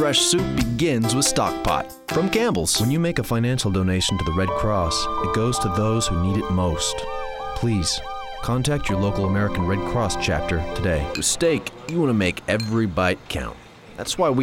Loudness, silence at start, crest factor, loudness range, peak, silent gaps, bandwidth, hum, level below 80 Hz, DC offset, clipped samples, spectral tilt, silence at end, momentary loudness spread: -22 LUFS; 0 s; 16 dB; 3 LU; -6 dBFS; none; 17 kHz; none; -36 dBFS; under 0.1%; under 0.1%; -4.5 dB/octave; 0 s; 7 LU